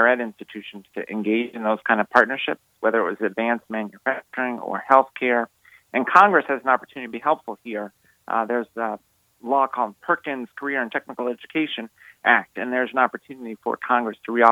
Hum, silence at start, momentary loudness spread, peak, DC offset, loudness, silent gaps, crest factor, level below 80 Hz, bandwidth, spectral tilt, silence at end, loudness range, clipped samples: none; 0 s; 15 LU; 0 dBFS; under 0.1%; -22 LUFS; none; 22 dB; -74 dBFS; 16 kHz; -5.5 dB/octave; 0 s; 6 LU; under 0.1%